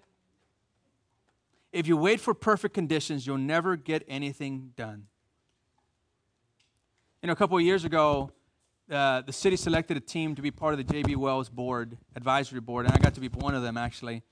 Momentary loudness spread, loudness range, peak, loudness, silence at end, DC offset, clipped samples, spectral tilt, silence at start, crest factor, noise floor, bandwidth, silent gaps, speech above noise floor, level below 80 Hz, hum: 12 LU; 7 LU; -6 dBFS; -28 LUFS; 0.1 s; under 0.1%; under 0.1%; -6 dB/octave; 1.75 s; 24 dB; -76 dBFS; 10.5 kHz; none; 48 dB; -46 dBFS; none